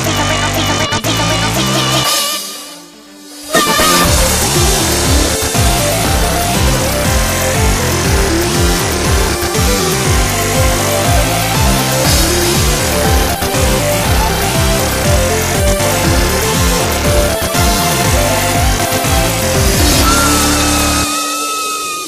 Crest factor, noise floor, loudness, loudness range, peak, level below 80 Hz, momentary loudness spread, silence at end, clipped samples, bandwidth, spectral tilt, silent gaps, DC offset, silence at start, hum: 12 dB; -35 dBFS; -12 LUFS; 2 LU; 0 dBFS; -20 dBFS; 3 LU; 0 s; under 0.1%; 15.5 kHz; -3.5 dB/octave; none; under 0.1%; 0 s; none